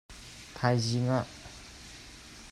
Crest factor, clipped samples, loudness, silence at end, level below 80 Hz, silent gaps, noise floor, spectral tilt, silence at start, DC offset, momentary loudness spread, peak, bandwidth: 20 dB; under 0.1%; -30 LUFS; 0 s; -56 dBFS; none; -49 dBFS; -5.5 dB/octave; 0.1 s; under 0.1%; 19 LU; -14 dBFS; 12.5 kHz